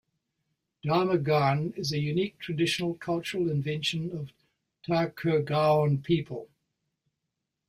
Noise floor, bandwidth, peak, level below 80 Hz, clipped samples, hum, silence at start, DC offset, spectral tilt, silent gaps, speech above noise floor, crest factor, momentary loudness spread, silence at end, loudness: -84 dBFS; 15.5 kHz; -12 dBFS; -64 dBFS; under 0.1%; none; 0.85 s; under 0.1%; -6 dB/octave; none; 57 dB; 18 dB; 12 LU; 1.25 s; -28 LUFS